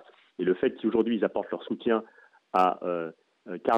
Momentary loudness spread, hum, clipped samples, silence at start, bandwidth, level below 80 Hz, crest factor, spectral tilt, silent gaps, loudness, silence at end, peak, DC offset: 9 LU; none; under 0.1%; 0.4 s; 8.2 kHz; -70 dBFS; 18 dB; -7.5 dB/octave; none; -28 LUFS; 0 s; -10 dBFS; under 0.1%